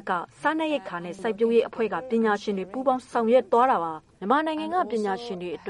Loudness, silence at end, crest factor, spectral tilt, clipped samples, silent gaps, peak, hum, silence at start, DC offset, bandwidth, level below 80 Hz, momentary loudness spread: -25 LUFS; 0 s; 18 dB; -6 dB/octave; under 0.1%; none; -8 dBFS; none; 0.05 s; under 0.1%; 11 kHz; -66 dBFS; 10 LU